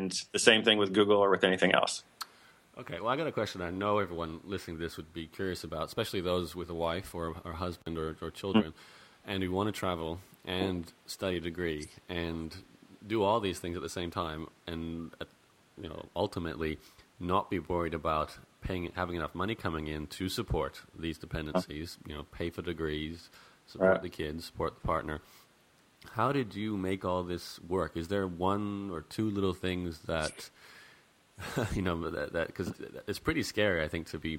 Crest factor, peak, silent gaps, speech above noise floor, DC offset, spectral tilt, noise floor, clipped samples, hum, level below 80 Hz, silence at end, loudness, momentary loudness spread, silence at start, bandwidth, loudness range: 30 dB; -4 dBFS; none; 32 dB; under 0.1%; -4.5 dB/octave; -65 dBFS; under 0.1%; none; -52 dBFS; 0 s; -33 LUFS; 15 LU; 0 s; 16 kHz; 4 LU